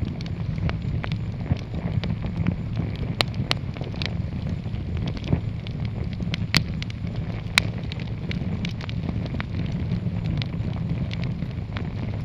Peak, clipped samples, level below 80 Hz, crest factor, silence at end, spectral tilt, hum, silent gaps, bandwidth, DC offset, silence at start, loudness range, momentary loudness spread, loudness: 0 dBFS; under 0.1%; -36 dBFS; 26 dB; 0 s; -5.5 dB/octave; none; none; 17.5 kHz; under 0.1%; 0 s; 2 LU; 7 LU; -28 LUFS